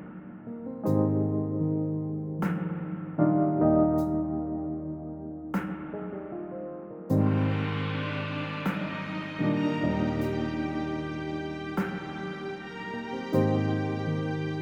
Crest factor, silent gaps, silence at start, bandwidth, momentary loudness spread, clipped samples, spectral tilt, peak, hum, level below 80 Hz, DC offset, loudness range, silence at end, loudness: 18 dB; none; 0 s; 16.5 kHz; 13 LU; under 0.1%; -8.5 dB/octave; -12 dBFS; none; -52 dBFS; under 0.1%; 5 LU; 0 s; -30 LUFS